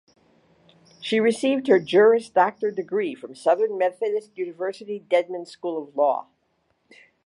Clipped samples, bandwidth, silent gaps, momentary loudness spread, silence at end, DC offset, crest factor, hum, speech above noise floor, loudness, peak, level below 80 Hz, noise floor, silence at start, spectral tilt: under 0.1%; 11.5 kHz; none; 13 LU; 1.05 s; under 0.1%; 18 dB; none; 48 dB; -23 LUFS; -4 dBFS; -74 dBFS; -70 dBFS; 1 s; -5 dB/octave